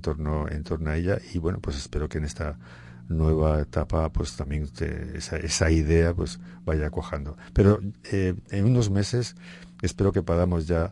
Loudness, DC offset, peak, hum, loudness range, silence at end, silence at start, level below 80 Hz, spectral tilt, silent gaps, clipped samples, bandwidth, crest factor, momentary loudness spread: -26 LUFS; under 0.1%; -6 dBFS; none; 3 LU; 0 s; 0 s; -36 dBFS; -6.5 dB/octave; none; under 0.1%; 11 kHz; 18 dB; 12 LU